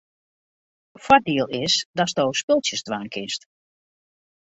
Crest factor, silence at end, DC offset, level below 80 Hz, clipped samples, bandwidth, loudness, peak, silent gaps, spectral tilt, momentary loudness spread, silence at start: 22 dB; 1.1 s; under 0.1%; -60 dBFS; under 0.1%; 8.2 kHz; -22 LUFS; -2 dBFS; 1.85-1.93 s, 2.43-2.48 s; -3 dB/octave; 12 LU; 1 s